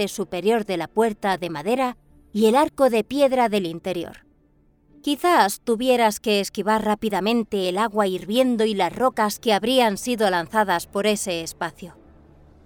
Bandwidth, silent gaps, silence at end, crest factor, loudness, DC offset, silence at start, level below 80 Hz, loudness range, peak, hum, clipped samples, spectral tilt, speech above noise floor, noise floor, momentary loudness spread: over 20 kHz; none; 0.75 s; 18 dB; -22 LUFS; under 0.1%; 0 s; -56 dBFS; 1 LU; -4 dBFS; none; under 0.1%; -4 dB/octave; 38 dB; -59 dBFS; 9 LU